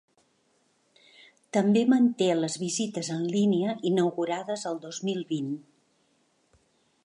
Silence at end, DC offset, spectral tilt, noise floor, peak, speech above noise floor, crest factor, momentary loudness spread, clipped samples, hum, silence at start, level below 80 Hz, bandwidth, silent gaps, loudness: 1.45 s; under 0.1%; -5.5 dB/octave; -69 dBFS; -12 dBFS; 43 dB; 16 dB; 10 LU; under 0.1%; none; 1.55 s; -78 dBFS; 11.5 kHz; none; -27 LUFS